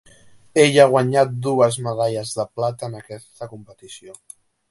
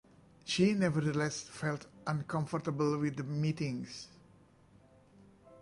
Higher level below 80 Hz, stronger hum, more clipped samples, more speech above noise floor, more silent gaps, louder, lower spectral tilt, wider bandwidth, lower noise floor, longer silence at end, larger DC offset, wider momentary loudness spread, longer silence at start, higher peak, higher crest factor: first, -62 dBFS vs -68 dBFS; neither; neither; about the same, 29 dB vs 29 dB; neither; first, -18 LUFS vs -34 LUFS; about the same, -5 dB/octave vs -6 dB/octave; about the same, 11.5 kHz vs 11.5 kHz; second, -48 dBFS vs -63 dBFS; first, 0.6 s vs 0 s; neither; first, 25 LU vs 12 LU; about the same, 0.55 s vs 0.45 s; first, 0 dBFS vs -16 dBFS; about the same, 20 dB vs 18 dB